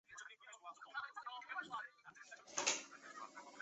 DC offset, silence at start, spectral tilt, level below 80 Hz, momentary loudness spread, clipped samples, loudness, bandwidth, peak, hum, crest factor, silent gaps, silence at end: under 0.1%; 0.1 s; 1 dB/octave; under -90 dBFS; 17 LU; under 0.1%; -46 LUFS; 8.2 kHz; -22 dBFS; none; 26 dB; none; 0 s